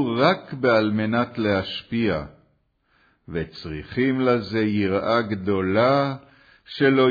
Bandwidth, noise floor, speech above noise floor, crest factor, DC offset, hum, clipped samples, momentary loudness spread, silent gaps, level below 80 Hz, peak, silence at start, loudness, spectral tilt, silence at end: 5 kHz; -66 dBFS; 44 dB; 18 dB; under 0.1%; none; under 0.1%; 12 LU; none; -52 dBFS; -4 dBFS; 0 s; -22 LUFS; -8 dB/octave; 0 s